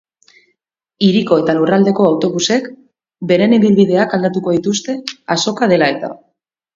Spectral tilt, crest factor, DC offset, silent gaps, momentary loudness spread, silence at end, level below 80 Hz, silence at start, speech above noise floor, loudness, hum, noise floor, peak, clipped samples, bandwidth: -5 dB/octave; 14 dB; under 0.1%; none; 12 LU; 0.6 s; -58 dBFS; 1 s; 56 dB; -14 LUFS; none; -69 dBFS; 0 dBFS; under 0.1%; 7.6 kHz